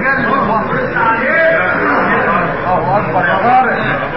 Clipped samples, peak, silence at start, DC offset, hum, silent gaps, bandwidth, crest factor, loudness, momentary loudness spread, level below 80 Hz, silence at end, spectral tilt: under 0.1%; -2 dBFS; 0 s; 2%; none; none; 5.8 kHz; 12 dB; -12 LUFS; 4 LU; -40 dBFS; 0 s; -4 dB/octave